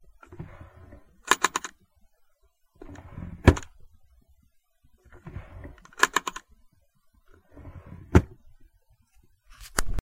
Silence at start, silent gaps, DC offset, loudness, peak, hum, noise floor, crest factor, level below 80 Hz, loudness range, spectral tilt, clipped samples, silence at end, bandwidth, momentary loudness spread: 0.3 s; none; under 0.1%; -25 LUFS; -2 dBFS; none; -65 dBFS; 28 dB; -38 dBFS; 4 LU; -4.5 dB/octave; under 0.1%; 0 s; 16 kHz; 25 LU